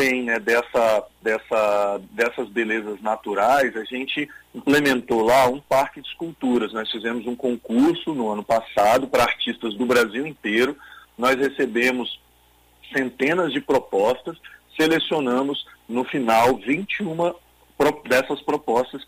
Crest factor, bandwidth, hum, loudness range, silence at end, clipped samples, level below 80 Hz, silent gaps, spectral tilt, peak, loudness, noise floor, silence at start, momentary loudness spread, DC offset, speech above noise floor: 16 dB; 15.5 kHz; none; 2 LU; 0.05 s; under 0.1%; -56 dBFS; none; -4.5 dB/octave; -6 dBFS; -22 LUFS; -57 dBFS; 0 s; 9 LU; under 0.1%; 35 dB